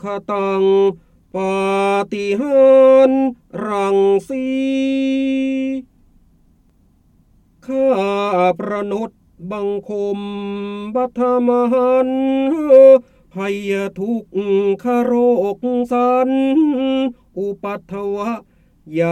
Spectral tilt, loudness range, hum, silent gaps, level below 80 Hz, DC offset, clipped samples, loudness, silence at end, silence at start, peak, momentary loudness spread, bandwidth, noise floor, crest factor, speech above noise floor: -7 dB/octave; 7 LU; none; none; -56 dBFS; under 0.1%; under 0.1%; -16 LUFS; 0 s; 0.05 s; 0 dBFS; 14 LU; 9.4 kHz; -54 dBFS; 16 dB; 39 dB